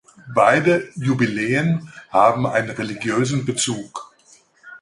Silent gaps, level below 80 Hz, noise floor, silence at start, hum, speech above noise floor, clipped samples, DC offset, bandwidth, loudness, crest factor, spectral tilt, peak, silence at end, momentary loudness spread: none; -58 dBFS; -54 dBFS; 0.25 s; none; 35 dB; under 0.1%; under 0.1%; 11.5 kHz; -19 LUFS; 20 dB; -5 dB/octave; -2 dBFS; 0.05 s; 10 LU